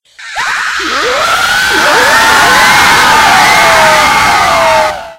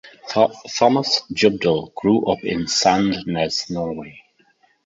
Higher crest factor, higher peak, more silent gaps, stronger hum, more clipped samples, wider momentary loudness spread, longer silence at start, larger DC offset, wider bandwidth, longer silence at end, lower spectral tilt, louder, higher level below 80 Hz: second, 8 dB vs 18 dB; about the same, 0 dBFS vs -2 dBFS; neither; neither; first, 2% vs under 0.1%; about the same, 8 LU vs 9 LU; first, 0.2 s vs 0.05 s; neither; first, over 20 kHz vs 7.8 kHz; second, 0.05 s vs 0.65 s; second, -1 dB/octave vs -4 dB/octave; first, -6 LUFS vs -19 LUFS; first, -34 dBFS vs -52 dBFS